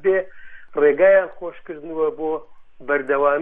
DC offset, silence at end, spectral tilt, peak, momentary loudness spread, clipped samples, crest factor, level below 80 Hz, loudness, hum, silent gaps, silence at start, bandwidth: under 0.1%; 0 s; -8.5 dB/octave; -6 dBFS; 19 LU; under 0.1%; 14 dB; -54 dBFS; -20 LUFS; none; none; 0 s; 3.7 kHz